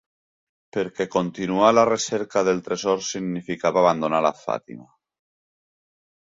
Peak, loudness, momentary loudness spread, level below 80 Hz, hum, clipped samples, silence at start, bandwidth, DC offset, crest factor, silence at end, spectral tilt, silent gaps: -4 dBFS; -22 LUFS; 12 LU; -62 dBFS; none; under 0.1%; 0.75 s; 7.8 kHz; under 0.1%; 20 dB; 1.5 s; -4.5 dB/octave; none